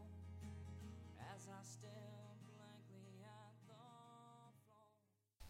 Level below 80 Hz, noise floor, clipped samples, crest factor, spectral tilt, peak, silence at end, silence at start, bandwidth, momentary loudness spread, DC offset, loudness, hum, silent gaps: -72 dBFS; -82 dBFS; under 0.1%; 16 dB; -5.5 dB/octave; -44 dBFS; 0 s; 0 s; 16 kHz; 8 LU; under 0.1%; -59 LUFS; none; none